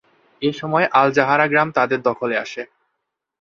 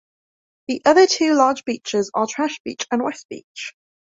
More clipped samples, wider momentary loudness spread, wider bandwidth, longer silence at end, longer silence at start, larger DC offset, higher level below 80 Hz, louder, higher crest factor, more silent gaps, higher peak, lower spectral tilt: neither; second, 12 LU vs 19 LU; about the same, 7.4 kHz vs 7.8 kHz; first, 0.75 s vs 0.4 s; second, 0.4 s vs 0.7 s; neither; about the same, -64 dBFS vs -66 dBFS; about the same, -18 LUFS vs -19 LUFS; about the same, 18 dB vs 18 dB; second, none vs 2.60-2.65 s, 3.25-3.29 s, 3.44-3.55 s; about the same, 0 dBFS vs -2 dBFS; first, -6 dB/octave vs -3 dB/octave